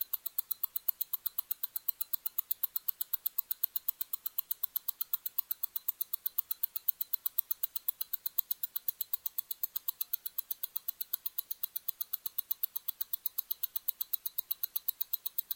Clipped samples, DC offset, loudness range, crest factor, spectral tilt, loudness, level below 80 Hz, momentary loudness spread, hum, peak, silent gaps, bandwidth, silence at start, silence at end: under 0.1%; under 0.1%; 2 LU; 32 dB; 2.5 dB/octave; -34 LUFS; -82 dBFS; 4 LU; none; -6 dBFS; none; 17 kHz; 0 s; 0 s